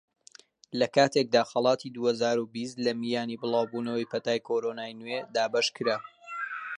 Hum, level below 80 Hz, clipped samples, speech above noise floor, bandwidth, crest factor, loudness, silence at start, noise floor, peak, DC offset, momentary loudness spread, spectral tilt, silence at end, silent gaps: none; -80 dBFS; under 0.1%; 28 dB; 11 kHz; 20 dB; -29 LUFS; 0.75 s; -56 dBFS; -8 dBFS; under 0.1%; 11 LU; -4 dB/octave; 0.05 s; none